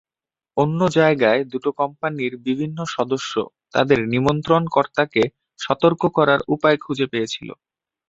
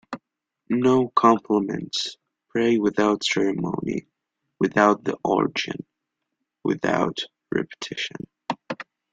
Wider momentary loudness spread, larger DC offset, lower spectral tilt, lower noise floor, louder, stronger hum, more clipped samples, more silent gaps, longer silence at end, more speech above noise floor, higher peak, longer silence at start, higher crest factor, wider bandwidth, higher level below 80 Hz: second, 9 LU vs 14 LU; neither; about the same, -6 dB/octave vs -5 dB/octave; first, under -90 dBFS vs -81 dBFS; first, -20 LUFS vs -23 LUFS; neither; neither; neither; first, 0.55 s vs 0.3 s; first, over 71 dB vs 59 dB; about the same, -2 dBFS vs -2 dBFS; first, 0.55 s vs 0.1 s; about the same, 18 dB vs 22 dB; second, 8 kHz vs 9.2 kHz; first, -54 dBFS vs -62 dBFS